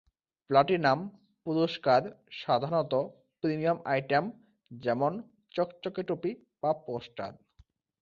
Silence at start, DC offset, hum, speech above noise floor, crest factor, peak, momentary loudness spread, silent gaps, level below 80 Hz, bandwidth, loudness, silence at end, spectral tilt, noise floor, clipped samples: 0.5 s; under 0.1%; none; 35 dB; 22 dB; -8 dBFS; 15 LU; none; -70 dBFS; 7.2 kHz; -30 LUFS; 0.7 s; -7.5 dB/octave; -64 dBFS; under 0.1%